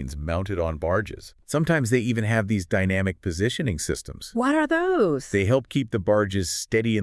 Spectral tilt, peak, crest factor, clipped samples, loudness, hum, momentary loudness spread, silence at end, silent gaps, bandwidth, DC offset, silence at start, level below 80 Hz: -5.5 dB/octave; -8 dBFS; 16 dB; under 0.1%; -24 LUFS; none; 7 LU; 0 s; none; 12 kHz; under 0.1%; 0 s; -46 dBFS